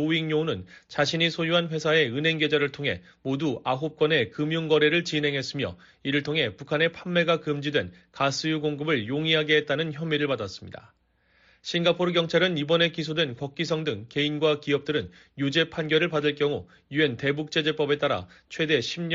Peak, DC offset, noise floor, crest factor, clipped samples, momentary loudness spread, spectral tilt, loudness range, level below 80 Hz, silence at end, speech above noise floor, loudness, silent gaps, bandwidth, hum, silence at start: -8 dBFS; under 0.1%; -65 dBFS; 18 dB; under 0.1%; 8 LU; -3 dB/octave; 2 LU; -64 dBFS; 0 s; 39 dB; -25 LUFS; none; 7.6 kHz; none; 0 s